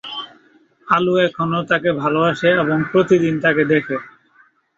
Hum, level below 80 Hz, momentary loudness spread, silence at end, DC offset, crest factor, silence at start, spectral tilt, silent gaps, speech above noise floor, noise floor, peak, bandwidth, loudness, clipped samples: none; -58 dBFS; 12 LU; 0.7 s; under 0.1%; 16 dB; 0.05 s; -7 dB/octave; none; 39 dB; -55 dBFS; -2 dBFS; 7.8 kHz; -17 LUFS; under 0.1%